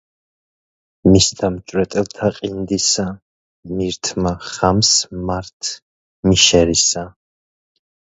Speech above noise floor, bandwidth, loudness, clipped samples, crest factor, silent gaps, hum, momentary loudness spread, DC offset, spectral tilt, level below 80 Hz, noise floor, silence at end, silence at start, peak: over 73 dB; 8.2 kHz; -16 LUFS; under 0.1%; 18 dB; 3.22-3.63 s, 5.53-5.60 s, 5.82-6.23 s; none; 14 LU; under 0.1%; -3.5 dB/octave; -38 dBFS; under -90 dBFS; 0.9 s; 1.05 s; 0 dBFS